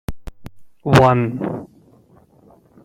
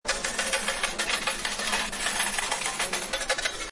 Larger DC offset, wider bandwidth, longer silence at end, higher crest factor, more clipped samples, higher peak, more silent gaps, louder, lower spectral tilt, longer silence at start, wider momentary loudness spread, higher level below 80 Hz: neither; first, 15.5 kHz vs 11.5 kHz; first, 1.2 s vs 0 s; about the same, 20 dB vs 18 dB; neither; first, 0 dBFS vs -12 dBFS; neither; first, -16 LUFS vs -27 LUFS; first, -7 dB/octave vs 0 dB/octave; about the same, 0.1 s vs 0.05 s; first, 25 LU vs 2 LU; first, -40 dBFS vs -46 dBFS